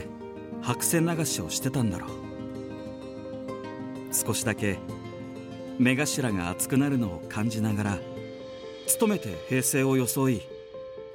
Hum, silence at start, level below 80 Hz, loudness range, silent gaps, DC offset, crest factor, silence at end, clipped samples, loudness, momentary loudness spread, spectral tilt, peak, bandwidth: none; 0 s; -60 dBFS; 5 LU; none; under 0.1%; 20 dB; 0 s; under 0.1%; -28 LUFS; 15 LU; -4.5 dB/octave; -8 dBFS; 17.5 kHz